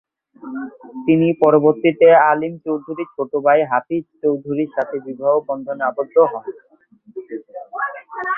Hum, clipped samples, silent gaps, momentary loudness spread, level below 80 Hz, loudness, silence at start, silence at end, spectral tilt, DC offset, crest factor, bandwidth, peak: none; under 0.1%; none; 19 LU; -66 dBFS; -17 LUFS; 0.45 s; 0 s; -10 dB/octave; under 0.1%; 18 dB; 3.5 kHz; 0 dBFS